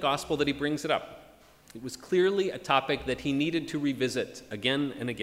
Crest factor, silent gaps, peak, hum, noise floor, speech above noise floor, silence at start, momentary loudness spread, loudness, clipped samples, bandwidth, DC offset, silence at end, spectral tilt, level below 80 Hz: 22 dB; none; -8 dBFS; none; -55 dBFS; 26 dB; 0 s; 13 LU; -29 LUFS; under 0.1%; 16 kHz; under 0.1%; 0 s; -5 dB/octave; -58 dBFS